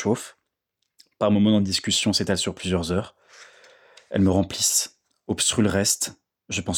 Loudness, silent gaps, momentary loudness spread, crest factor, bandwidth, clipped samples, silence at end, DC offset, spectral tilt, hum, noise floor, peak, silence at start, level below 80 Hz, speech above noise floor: -22 LUFS; none; 10 LU; 16 dB; over 20 kHz; under 0.1%; 0 s; under 0.1%; -3.5 dB/octave; none; -79 dBFS; -8 dBFS; 0 s; -58 dBFS; 56 dB